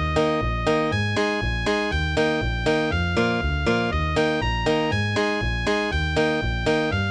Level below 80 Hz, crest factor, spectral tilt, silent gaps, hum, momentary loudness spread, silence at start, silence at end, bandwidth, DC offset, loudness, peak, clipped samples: -32 dBFS; 16 dB; -6 dB/octave; none; none; 1 LU; 0 s; 0 s; 10.5 kHz; under 0.1%; -23 LUFS; -8 dBFS; under 0.1%